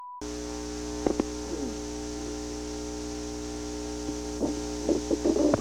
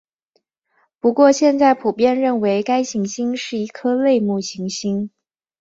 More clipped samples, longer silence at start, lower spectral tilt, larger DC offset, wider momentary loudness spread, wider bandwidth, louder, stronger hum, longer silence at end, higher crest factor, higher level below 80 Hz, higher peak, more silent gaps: neither; second, 0 s vs 1.05 s; about the same, -5 dB/octave vs -5 dB/octave; first, 0.2% vs under 0.1%; about the same, 9 LU vs 10 LU; first, 15.5 kHz vs 8 kHz; second, -32 LUFS vs -18 LUFS; first, 60 Hz at -45 dBFS vs none; second, 0 s vs 0.5 s; first, 24 dB vs 16 dB; first, -44 dBFS vs -64 dBFS; second, -8 dBFS vs -2 dBFS; neither